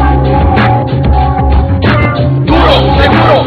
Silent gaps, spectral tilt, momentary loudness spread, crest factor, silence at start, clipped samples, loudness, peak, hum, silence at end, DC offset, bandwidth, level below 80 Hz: none; -9 dB/octave; 4 LU; 8 dB; 0 s; 2%; -8 LUFS; 0 dBFS; none; 0 s; under 0.1%; 5.4 kHz; -14 dBFS